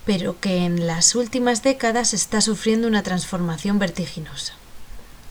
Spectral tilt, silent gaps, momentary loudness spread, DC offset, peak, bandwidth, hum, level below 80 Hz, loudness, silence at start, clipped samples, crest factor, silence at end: -3.5 dB/octave; none; 13 LU; under 0.1%; -2 dBFS; over 20 kHz; none; -44 dBFS; -21 LUFS; 0 s; under 0.1%; 20 dB; 0 s